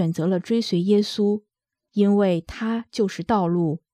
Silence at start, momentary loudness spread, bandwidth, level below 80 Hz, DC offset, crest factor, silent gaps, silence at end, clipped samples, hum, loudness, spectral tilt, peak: 0 s; 7 LU; 11 kHz; -54 dBFS; under 0.1%; 14 dB; none; 0.15 s; under 0.1%; none; -22 LUFS; -7 dB/octave; -8 dBFS